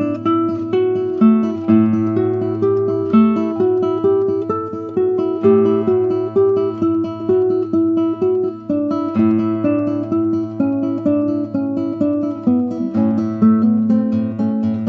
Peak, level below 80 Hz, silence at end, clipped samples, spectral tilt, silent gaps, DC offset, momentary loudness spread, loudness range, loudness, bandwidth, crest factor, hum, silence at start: -2 dBFS; -62 dBFS; 0 s; under 0.1%; -10.5 dB/octave; none; under 0.1%; 6 LU; 3 LU; -17 LUFS; 4.9 kHz; 14 dB; none; 0 s